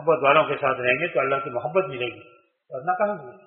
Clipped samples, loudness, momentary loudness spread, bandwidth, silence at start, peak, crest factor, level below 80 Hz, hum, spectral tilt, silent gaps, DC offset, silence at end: under 0.1%; -23 LUFS; 13 LU; 4 kHz; 0 s; -2 dBFS; 22 dB; -66 dBFS; none; -3 dB/octave; none; under 0.1%; 0.1 s